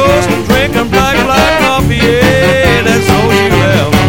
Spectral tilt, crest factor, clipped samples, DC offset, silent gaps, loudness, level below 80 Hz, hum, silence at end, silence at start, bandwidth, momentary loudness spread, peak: -5 dB/octave; 8 dB; 1%; 3%; none; -8 LUFS; -24 dBFS; none; 0 s; 0 s; 17.5 kHz; 2 LU; 0 dBFS